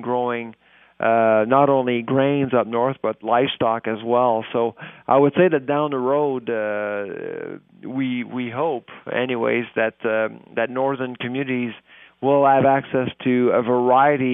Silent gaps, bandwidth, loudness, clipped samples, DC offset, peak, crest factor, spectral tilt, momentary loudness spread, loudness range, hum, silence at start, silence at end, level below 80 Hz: none; 3.8 kHz; -20 LUFS; under 0.1%; under 0.1%; -2 dBFS; 18 dB; -11 dB/octave; 11 LU; 5 LU; none; 0 s; 0 s; -68 dBFS